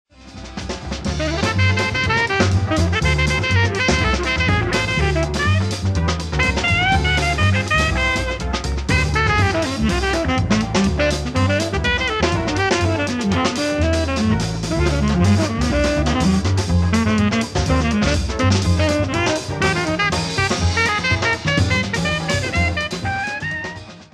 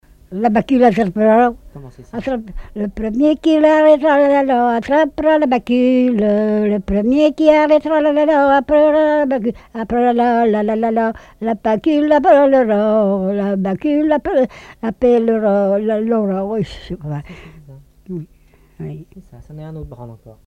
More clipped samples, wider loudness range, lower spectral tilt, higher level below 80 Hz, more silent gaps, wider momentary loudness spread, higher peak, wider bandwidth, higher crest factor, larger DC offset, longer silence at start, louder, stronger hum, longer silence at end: neither; second, 1 LU vs 8 LU; second, -5 dB/octave vs -7.5 dB/octave; first, -28 dBFS vs -42 dBFS; neither; second, 6 LU vs 18 LU; about the same, -2 dBFS vs 0 dBFS; first, 12.5 kHz vs 8.6 kHz; about the same, 16 dB vs 14 dB; neither; about the same, 0.2 s vs 0.3 s; second, -18 LUFS vs -14 LUFS; neither; about the same, 0.1 s vs 0.15 s